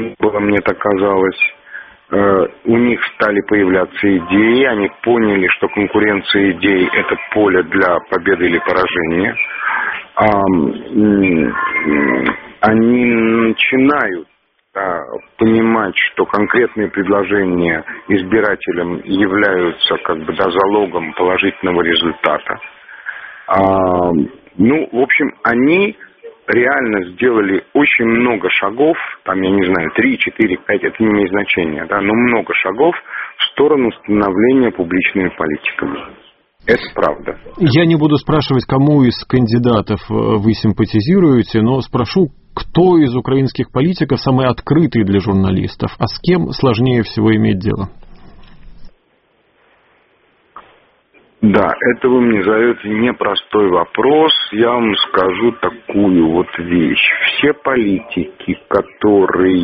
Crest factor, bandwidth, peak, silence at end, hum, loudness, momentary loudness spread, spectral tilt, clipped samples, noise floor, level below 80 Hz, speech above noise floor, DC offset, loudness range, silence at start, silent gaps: 14 dB; 5.8 kHz; 0 dBFS; 0 s; none; -14 LUFS; 7 LU; -4.5 dB/octave; under 0.1%; -57 dBFS; -42 dBFS; 44 dB; under 0.1%; 3 LU; 0 s; none